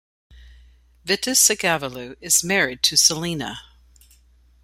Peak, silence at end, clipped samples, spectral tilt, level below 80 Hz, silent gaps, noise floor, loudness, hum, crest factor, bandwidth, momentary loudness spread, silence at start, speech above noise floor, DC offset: -2 dBFS; 1.05 s; under 0.1%; -1 dB/octave; -52 dBFS; none; -55 dBFS; -18 LUFS; none; 22 dB; 16 kHz; 18 LU; 0.35 s; 34 dB; under 0.1%